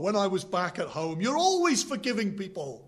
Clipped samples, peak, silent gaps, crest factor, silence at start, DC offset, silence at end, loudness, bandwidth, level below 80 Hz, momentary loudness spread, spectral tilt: under 0.1%; -12 dBFS; none; 16 dB; 0 s; under 0.1%; 0.05 s; -28 LUFS; 13.5 kHz; -68 dBFS; 9 LU; -4 dB/octave